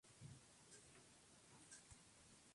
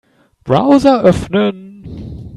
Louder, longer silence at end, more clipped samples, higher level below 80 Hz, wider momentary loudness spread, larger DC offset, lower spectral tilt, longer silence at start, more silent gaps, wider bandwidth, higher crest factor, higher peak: second, -65 LUFS vs -12 LUFS; about the same, 0 s vs 0 s; neither; second, -80 dBFS vs -38 dBFS; second, 4 LU vs 23 LU; neither; second, -3 dB/octave vs -7 dB/octave; second, 0.05 s vs 0.45 s; neither; about the same, 11.5 kHz vs 11.5 kHz; about the same, 18 dB vs 14 dB; second, -48 dBFS vs 0 dBFS